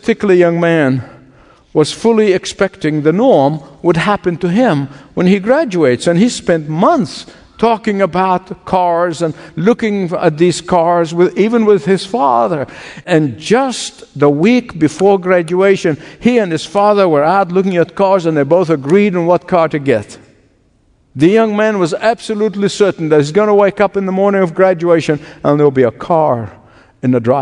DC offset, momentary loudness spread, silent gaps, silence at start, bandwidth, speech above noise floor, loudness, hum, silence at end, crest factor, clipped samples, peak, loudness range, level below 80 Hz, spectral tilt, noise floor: under 0.1%; 7 LU; none; 0.05 s; 11 kHz; 41 dB; -13 LUFS; none; 0 s; 12 dB; 0.1%; 0 dBFS; 2 LU; -50 dBFS; -6.5 dB/octave; -53 dBFS